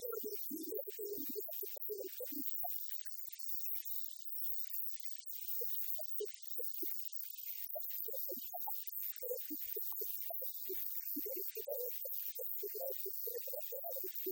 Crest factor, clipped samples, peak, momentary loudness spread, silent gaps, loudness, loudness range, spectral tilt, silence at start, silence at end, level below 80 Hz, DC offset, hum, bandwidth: 20 dB; under 0.1%; -22 dBFS; 5 LU; none; -40 LUFS; 2 LU; -1 dB/octave; 0 s; 0 s; under -90 dBFS; under 0.1%; none; over 20 kHz